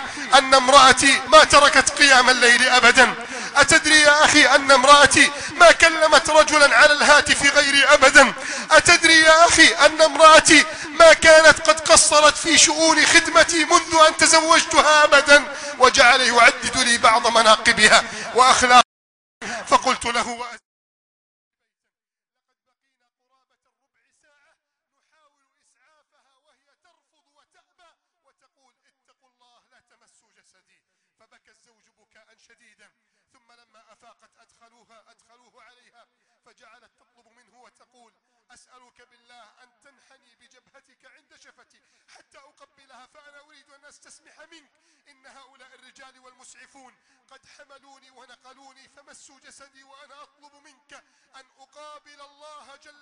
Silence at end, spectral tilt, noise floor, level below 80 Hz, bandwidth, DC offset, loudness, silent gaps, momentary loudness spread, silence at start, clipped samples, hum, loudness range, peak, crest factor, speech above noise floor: 32.45 s; -0.5 dB/octave; -87 dBFS; -48 dBFS; 12.5 kHz; under 0.1%; -13 LUFS; 18.85-19.41 s; 8 LU; 0 s; under 0.1%; none; 7 LU; 0 dBFS; 18 dB; 71 dB